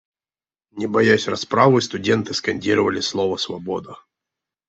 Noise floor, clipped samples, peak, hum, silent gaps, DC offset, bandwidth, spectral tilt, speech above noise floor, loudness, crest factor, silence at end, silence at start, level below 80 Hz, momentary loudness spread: under -90 dBFS; under 0.1%; -2 dBFS; none; none; under 0.1%; 8.2 kHz; -5 dB/octave; over 71 dB; -20 LUFS; 20 dB; 0.75 s; 0.75 s; -60 dBFS; 12 LU